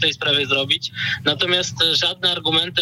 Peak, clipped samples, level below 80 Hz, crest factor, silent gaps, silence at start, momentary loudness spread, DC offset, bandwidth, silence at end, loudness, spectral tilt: -8 dBFS; under 0.1%; -58 dBFS; 12 dB; none; 0 s; 4 LU; under 0.1%; 16 kHz; 0 s; -18 LUFS; -2.5 dB/octave